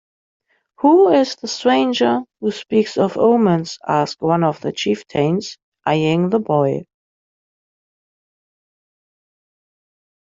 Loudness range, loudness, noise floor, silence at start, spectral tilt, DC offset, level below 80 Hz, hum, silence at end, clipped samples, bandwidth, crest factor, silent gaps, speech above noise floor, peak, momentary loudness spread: 7 LU; -17 LUFS; under -90 dBFS; 0.8 s; -6 dB/octave; under 0.1%; -62 dBFS; none; 3.45 s; under 0.1%; 7.8 kHz; 16 dB; 5.63-5.72 s; over 74 dB; -2 dBFS; 8 LU